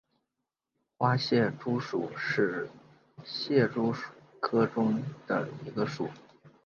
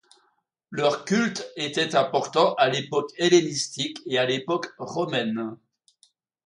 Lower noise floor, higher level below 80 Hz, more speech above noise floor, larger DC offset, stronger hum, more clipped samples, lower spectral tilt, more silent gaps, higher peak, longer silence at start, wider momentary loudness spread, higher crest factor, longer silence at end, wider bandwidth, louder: first, -87 dBFS vs -70 dBFS; about the same, -72 dBFS vs -72 dBFS; first, 57 dB vs 46 dB; neither; neither; neither; first, -7 dB/octave vs -4 dB/octave; neither; second, -12 dBFS vs -6 dBFS; first, 1 s vs 0.7 s; about the same, 12 LU vs 10 LU; about the same, 20 dB vs 20 dB; second, 0.15 s vs 0.9 s; second, 7.2 kHz vs 11.5 kHz; second, -30 LUFS vs -24 LUFS